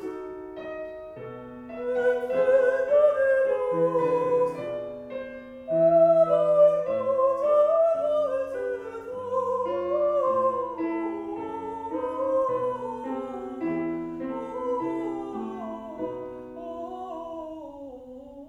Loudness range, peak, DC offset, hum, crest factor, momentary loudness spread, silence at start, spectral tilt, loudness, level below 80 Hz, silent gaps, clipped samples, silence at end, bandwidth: 11 LU; -10 dBFS; under 0.1%; none; 16 dB; 18 LU; 0 s; -7.5 dB/octave; -25 LUFS; -62 dBFS; none; under 0.1%; 0 s; 8.4 kHz